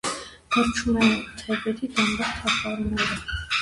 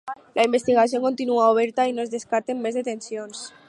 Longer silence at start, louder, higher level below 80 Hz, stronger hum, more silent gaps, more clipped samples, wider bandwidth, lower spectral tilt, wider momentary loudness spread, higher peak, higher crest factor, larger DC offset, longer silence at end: about the same, 0.05 s vs 0.05 s; about the same, -24 LUFS vs -22 LUFS; first, -42 dBFS vs -72 dBFS; neither; neither; neither; about the same, 11.5 kHz vs 11.5 kHz; about the same, -3.5 dB/octave vs -4 dB/octave; second, 8 LU vs 12 LU; about the same, -6 dBFS vs -6 dBFS; about the same, 18 dB vs 18 dB; neither; second, 0 s vs 0.2 s